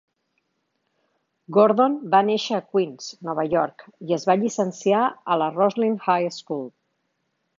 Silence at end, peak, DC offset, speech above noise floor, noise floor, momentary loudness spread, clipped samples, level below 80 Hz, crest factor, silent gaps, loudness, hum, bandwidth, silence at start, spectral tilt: 0.9 s; -4 dBFS; under 0.1%; 53 dB; -74 dBFS; 12 LU; under 0.1%; -70 dBFS; 20 dB; none; -22 LUFS; none; 7.6 kHz; 1.5 s; -5.5 dB/octave